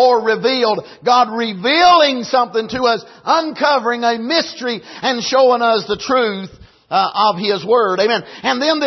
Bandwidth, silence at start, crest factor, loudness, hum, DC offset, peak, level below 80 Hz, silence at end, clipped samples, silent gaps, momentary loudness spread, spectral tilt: 6.2 kHz; 0 s; 14 dB; -15 LUFS; none; under 0.1%; -2 dBFS; -56 dBFS; 0 s; under 0.1%; none; 8 LU; -3.5 dB/octave